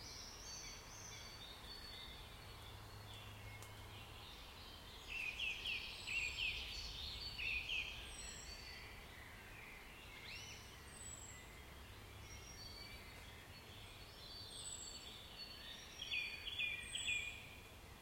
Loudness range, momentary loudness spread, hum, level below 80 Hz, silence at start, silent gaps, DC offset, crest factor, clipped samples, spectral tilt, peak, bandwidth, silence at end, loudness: 11 LU; 14 LU; none; -62 dBFS; 0 s; none; under 0.1%; 20 dB; under 0.1%; -1.5 dB/octave; -30 dBFS; 16.5 kHz; 0 s; -48 LUFS